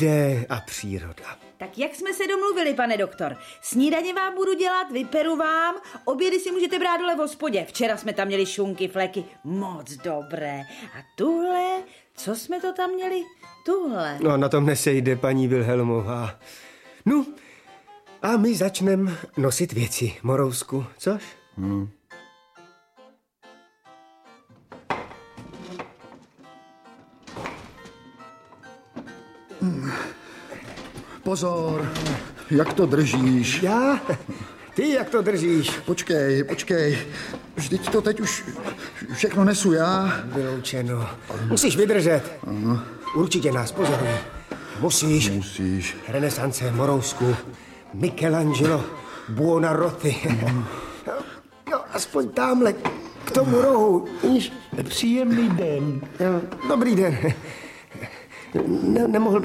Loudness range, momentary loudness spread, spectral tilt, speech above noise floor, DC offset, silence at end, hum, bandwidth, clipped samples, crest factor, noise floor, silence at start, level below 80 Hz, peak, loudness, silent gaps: 13 LU; 17 LU; -5 dB/octave; 32 dB; under 0.1%; 0 s; none; 16 kHz; under 0.1%; 18 dB; -55 dBFS; 0 s; -54 dBFS; -6 dBFS; -23 LUFS; none